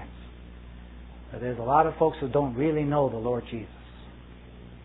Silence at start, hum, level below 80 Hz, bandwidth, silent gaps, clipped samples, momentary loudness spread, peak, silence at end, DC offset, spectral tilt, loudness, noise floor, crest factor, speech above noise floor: 0 s; 60 Hz at -45 dBFS; -46 dBFS; 4 kHz; none; under 0.1%; 24 LU; -8 dBFS; 0 s; under 0.1%; -11.5 dB/octave; -26 LUFS; -46 dBFS; 20 dB; 20 dB